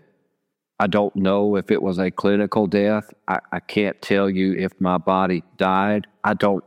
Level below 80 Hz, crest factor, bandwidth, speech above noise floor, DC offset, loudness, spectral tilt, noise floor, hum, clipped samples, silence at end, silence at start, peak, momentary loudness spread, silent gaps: -62 dBFS; 16 dB; 10.5 kHz; 56 dB; under 0.1%; -21 LUFS; -7.5 dB/octave; -76 dBFS; none; under 0.1%; 0.05 s; 0.8 s; -4 dBFS; 6 LU; none